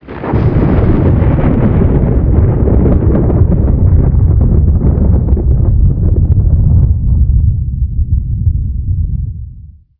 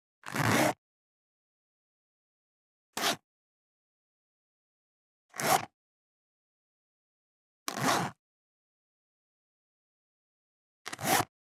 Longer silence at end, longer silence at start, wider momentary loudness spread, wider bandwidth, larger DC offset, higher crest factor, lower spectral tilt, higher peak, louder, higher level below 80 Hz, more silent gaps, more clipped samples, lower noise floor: about the same, 0.3 s vs 0.3 s; second, 0.05 s vs 0.25 s; second, 7 LU vs 16 LU; second, 3.3 kHz vs 17.5 kHz; neither; second, 10 dB vs 26 dB; first, -13 dB/octave vs -3 dB/octave; first, 0 dBFS vs -12 dBFS; first, -11 LUFS vs -30 LUFS; first, -12 dBFS vs -76 dBFS; second, none vs 0.78-2.93 s, 3.24-5.29 s, 5.74-7.66 s, 8.19-10.85 s; first, 0.4% vs under 0.1%; second, -33 dBFS vs under -90 dBFS